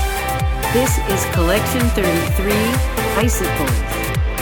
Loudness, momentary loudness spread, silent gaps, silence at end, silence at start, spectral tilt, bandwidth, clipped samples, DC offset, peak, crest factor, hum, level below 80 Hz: -18 LUFS; 4 LU; none; 0 s; 0 s; -4.5 dB/octave; over 20 kHz; under 0.1%; under 0.1%; -2 dBFS; 16 dB; none; -22 dBFS